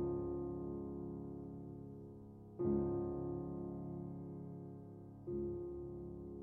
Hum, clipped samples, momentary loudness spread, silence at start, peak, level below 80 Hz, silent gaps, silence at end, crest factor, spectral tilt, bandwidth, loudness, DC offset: none; under 0.1%; 14 LU; 0 s; -26 dBFS; -60 dBFS; none; 0 s; 18 dB; -13.5 dB/octave; 2.2 kHz; -45 LUFS; under 0.1%